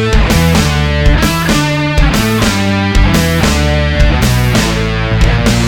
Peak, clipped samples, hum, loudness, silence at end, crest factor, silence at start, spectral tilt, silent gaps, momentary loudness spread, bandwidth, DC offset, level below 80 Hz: 0 dBFS; under 0.1%; none; -11 LUFS; 0 s; 10 dB; 0 s; -5 dB/octave; none; 2 LU; 18 kHz; under 0.1%; -14 dBFS